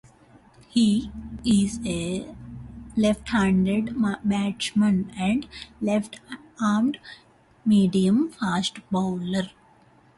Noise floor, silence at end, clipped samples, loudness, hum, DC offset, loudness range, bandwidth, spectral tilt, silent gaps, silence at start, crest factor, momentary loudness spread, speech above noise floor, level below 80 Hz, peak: -56 dBFS; 0.7 s; under 0.1%; -24 LUFS; none; under 0.1%; 2 LU; 11.5 kHz; -6 dB/octave; none; 0.75 s; 14 dB; 16 LU; 33 dB; -50 dBFS; -10 dBFS